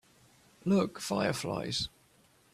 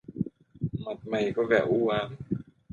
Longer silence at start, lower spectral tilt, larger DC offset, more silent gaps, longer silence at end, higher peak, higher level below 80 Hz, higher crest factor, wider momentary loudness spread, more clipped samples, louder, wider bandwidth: first, 0.65 s vs 0.1 s; second, -5 dB/octave vs -7.5 dB/octave; neither; neither; first, 0.65 s vs 0.3 s; second, -16 dBFS vs -10 dBFS; second, -62 dBFS vs -56 dBFS; about the same, 18 dB vs 18 dB; second, 8 LU vs 12 LU; neither; second, -32 LUFS vs -29 LUFS; first, 14.5 kHz vs 7.4 kHz